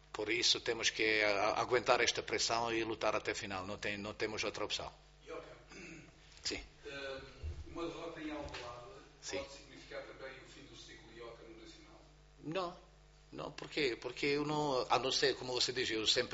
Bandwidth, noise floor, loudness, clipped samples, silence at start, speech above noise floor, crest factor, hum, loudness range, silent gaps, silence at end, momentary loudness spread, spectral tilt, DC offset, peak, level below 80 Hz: 8 kHz; -61 dBFS; -36 LUFS; under 0.1%; 0.15 s; 24 dB; 26 dB; none; 15 LU; none; 0 s; 21 LU; -1.5 dB/octave; under 0.1%; -12 dBFS; -62 dBFS